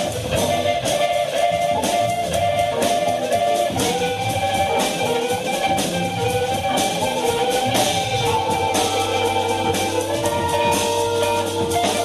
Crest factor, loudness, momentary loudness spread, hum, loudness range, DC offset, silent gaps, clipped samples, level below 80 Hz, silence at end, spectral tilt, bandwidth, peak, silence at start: 14 dB; -20 LUFS; 3 LU; none; 1 LU; under 0.1%; none; under 0.1%; -46 dBFS; 0 s; -3.5 dB/octave; 13.5 kHz; -6 dBFS; 0 s